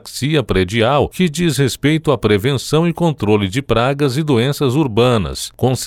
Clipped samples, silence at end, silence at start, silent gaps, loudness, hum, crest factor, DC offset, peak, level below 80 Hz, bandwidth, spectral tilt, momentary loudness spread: under 0.1%; 0 s; 0.05 s; none; -16 LUFS; none; 12 dB; under 0.1%; -2 dBFS; -36 dBFS; 16.5 kHz; -5.5 dB/octave; 3 LU